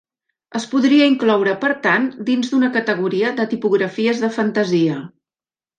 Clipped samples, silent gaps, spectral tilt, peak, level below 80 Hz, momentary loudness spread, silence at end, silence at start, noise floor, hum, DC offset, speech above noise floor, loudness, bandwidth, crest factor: under 0.1%; none; -5.5 dB/octave; -2 dBFS; -68 dBFS; 7 LU; 0.7 s; 0.55 s; under -90 dBFS; none; under 0.1%; over 73 dB; -17 LUFS; 9.2 kHz; 16 dB